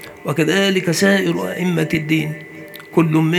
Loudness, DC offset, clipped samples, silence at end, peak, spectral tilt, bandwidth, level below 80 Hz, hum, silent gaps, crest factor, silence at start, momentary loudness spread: -17 LUFS; under 0.1%; under 0.1%; 0 s; 0 dBFS; -5.5 dB/octave; 18.5 kHz; -58 dBFS; none; none; 16 dB; 0 s; 12 LU